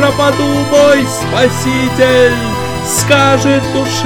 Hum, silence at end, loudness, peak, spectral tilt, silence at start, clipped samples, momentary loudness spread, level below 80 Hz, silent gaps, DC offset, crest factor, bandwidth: none; 0 s; -10 LUFS; 0 dBFS; -4.5 dB/octave; 0 s; under 0.1%; 6 LU; -34 dBFS; none; 0.8%; 10 dB; 19 kHz